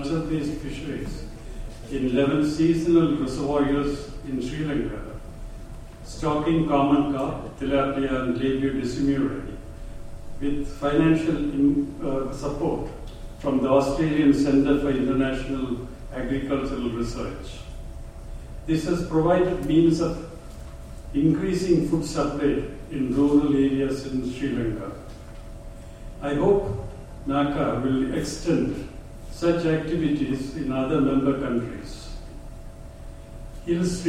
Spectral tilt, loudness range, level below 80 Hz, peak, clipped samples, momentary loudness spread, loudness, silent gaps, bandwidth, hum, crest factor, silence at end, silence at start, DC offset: -7 dB/octave; 5 LU; -38 dBFS; -6 dBFS; under 0.1%; 21 LU; -24 LUFS; none; 12.5 kHz; none; 18 dB; 0 s; 0 s; under 0.1%